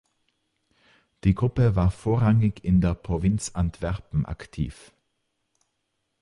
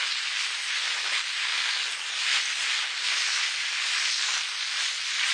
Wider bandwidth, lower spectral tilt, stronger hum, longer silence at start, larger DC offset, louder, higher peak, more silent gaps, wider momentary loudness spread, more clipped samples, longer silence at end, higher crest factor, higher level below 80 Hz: first, 11.5 kHz vs 10 kHz; first, -7.5 dB/octave vs 5.5 dB/octave; neither; first, 1.25 s vs 0 s; neither; about the same, -25 LUFS vs -25 LUFS; about the same, -8 dBFS vs -10 dBFS; neither; first, 11 LU vs 3 LU; neither; first, 1.5 s vs 0 s; about the same, 18 dB vs 18 dB; first, -38 dBFS vs under -90 dBFS